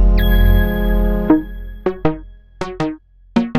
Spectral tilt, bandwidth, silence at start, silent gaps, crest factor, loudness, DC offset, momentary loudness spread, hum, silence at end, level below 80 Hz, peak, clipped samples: -8 dB/octave; 14 kHz; 0 s; none; 14 dB; -18 LUFS; under 0.1%; 15 LU; none; 0 s; -18 dBFS; -2 dBFS; under 0.1%